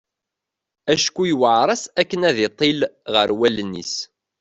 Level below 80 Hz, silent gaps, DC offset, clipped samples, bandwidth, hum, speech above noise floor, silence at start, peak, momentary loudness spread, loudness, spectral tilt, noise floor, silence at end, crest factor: -60 dBFS; none; under 0.1%; under 0.1%; 8.4 kHz; none; 65 dB; 0.85 s; -2 dBFS; 10 LU; -19 LUFS; -3.5 dB/octave; -84 dBFS; 0.35 s; 18 dB